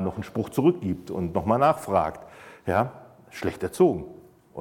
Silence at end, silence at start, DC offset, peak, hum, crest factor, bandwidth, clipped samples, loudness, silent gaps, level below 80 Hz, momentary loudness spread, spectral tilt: 0 s; 0 s; under 0.1%; -6 dBFS; none; 18 dB; 17 kHz; under 0.1%; -25 LUFS; none; -52 dBFS; 22 LU; -7.5 dB/octave